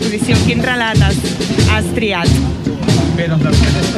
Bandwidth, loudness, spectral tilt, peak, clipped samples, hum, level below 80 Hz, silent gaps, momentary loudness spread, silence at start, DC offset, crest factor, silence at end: 13.5 kHz; -13 LUFS; -5.5 dB/octave; 0 dBFS; under 0.1%; none; -24 dBFS; none; 4 LU; 0 s; under 0.1%; 12 dB; 0 s